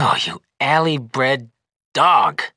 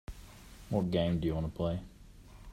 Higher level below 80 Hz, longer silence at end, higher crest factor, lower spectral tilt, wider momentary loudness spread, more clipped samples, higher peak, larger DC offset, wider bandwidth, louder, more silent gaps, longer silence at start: second, -66 dBFS vs -50 dBFS; about the same, 0.1 s vs 0 s; about the same, 16 dB vs 18 dB; second, -4.5 dB/octave vs -8 dB/octave; second, 10 LU vs 22 LU; neither; first, -2 dBFS vs -16 dBFS; neither; second, 11 kHz vs 14.5 kHz; first, -18 LUFS vs -34 LUFS; first, 1.76-1.92 s vs none; about the same, 0 s vs 0.1 s